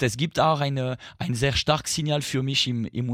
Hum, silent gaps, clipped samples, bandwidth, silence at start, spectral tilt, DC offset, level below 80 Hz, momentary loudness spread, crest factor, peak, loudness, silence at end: none; none; under 0.1%; 16 kHz; 0 s; -4.5 dB/octave; under 0.1%; -48 dBFS; 7 LU; 18 dB; -6 dBFS; -24 LUFS; 0 s